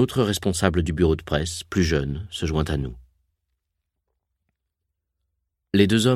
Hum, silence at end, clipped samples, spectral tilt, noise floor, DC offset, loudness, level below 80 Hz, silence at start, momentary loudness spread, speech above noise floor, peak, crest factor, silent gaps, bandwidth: none; 0 s; under 0.1%; -5.5 dB/octave; -80 dBFS; under 0.1%; -23 LUFS; -38 dBFS; 0 s; 8 LU; 59 dB; 0 dBFS; 24 dB; none; 15.5 kHz